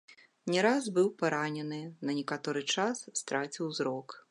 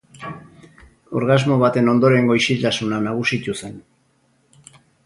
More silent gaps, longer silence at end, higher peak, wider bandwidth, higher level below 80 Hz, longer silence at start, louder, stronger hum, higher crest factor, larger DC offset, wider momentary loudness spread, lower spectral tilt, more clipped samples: neither; second, 0.1 s vs 1.25 s; second, -12 dBFS vs -2 dBFS; about the same, 11.5 kHz vs 11.5 kHz; second, -86 dBFS vs -56 dBFS; about the same, 0.1 s vs 0.2 s; second, -32 LUFS vs -18 LUFS; neither; about the same, 20 dB vs 18 dB; neither; second, 10 LU vs 20 LU; second, -4 dB/octave vs -6 dB/octave; neither